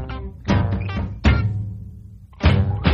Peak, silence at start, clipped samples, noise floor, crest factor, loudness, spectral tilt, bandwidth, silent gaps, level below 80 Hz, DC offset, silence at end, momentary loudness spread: -2 dBFS; 0 s; under 0.1%; -40 dBFS; 18 dB; -21 LUFS; -7.5 dB/octave; 7.2 kHz; none; -28 dBFS; under 0.1%; 0 s; 16 LU